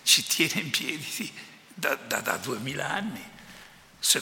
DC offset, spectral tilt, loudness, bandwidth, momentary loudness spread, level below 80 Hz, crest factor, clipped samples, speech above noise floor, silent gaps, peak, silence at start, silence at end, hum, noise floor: under 0.1%; -1.5 dB/octave; -27 LUFS; 17 kHz; 22 LU; -68 dBFS; 26 dB; under 0.1%; 20 dB; none; -4 dBFS; 0.05 s; 0 s; none; -51 dBFS